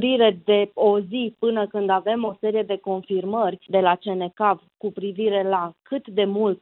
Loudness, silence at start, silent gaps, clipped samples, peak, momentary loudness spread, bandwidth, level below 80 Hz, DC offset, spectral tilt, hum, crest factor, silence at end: -23 LUFS; 0 s; none; under 0.1%; -4 dBFS; 9 LU; 4.1 kHz; -72 dBFS; under 0.1%; -10 dB/octave; none; 16 dB; 0.05 s